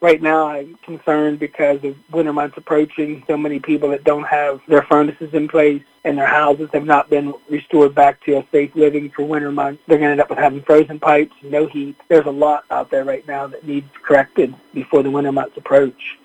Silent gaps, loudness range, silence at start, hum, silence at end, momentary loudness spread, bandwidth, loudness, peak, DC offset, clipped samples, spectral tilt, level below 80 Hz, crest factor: none; 3 LU; 0 s; none; 0.1 s; 10 LU; 9 kHz; -16 LUFS; 0 dBFS; under 0.1%; under 0.1%; -7.5 dB/octave; -58 dBFS; 16 dB